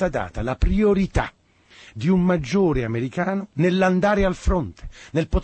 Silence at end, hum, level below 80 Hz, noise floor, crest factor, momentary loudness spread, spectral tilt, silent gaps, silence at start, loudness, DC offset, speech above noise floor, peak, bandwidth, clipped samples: 0 s; none; -30 dBFS; -51 dBFS; 16 dB; 9 LU; -7.5 dB/octave; none; 0 s; -22 LUFS; under 0.1%; 30 dB; -6 dBFS; 8.6 kHz; under 0.1%